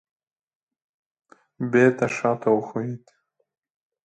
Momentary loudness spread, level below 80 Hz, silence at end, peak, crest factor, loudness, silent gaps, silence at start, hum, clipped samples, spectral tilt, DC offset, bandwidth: 14 LU; -68 dBFS; 1.1 s; -4 dBFS; 22 dB; -23 LUFS; none; 1.6 s; none; under 0.1%; -7 dB/octave; under 0.1%; 9 kHz